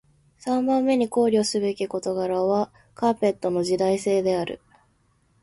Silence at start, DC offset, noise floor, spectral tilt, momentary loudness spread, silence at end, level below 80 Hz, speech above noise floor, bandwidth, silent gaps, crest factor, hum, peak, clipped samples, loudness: 0.45 s; under 0.1%; -64 dBFS; -5.5 dB/octave; 7 LU; 0.85 s; -62 dBFS; 42 dB; 11.5 kHz; none; 14 dB; none; -10 dBFS; under 0.1%; -23 LUFS